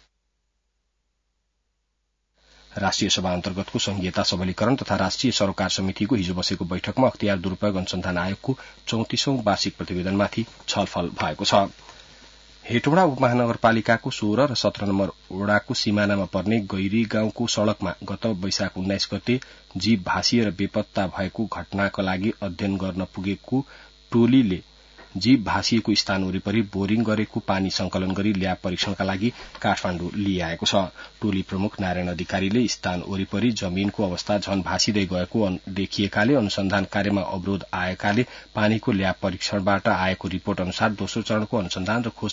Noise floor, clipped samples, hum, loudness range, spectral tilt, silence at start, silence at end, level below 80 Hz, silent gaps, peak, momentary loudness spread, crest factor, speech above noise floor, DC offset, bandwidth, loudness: -74 dBFS; under 0.1%; none; 3 LU; -5 dB/octave; 2.7 s; 0 s; -54 dBFS; none; -6 dBFS; 7 LU; 18 dB; 51 dB; under 0.1%; 7.8 kHz; -24 LUFS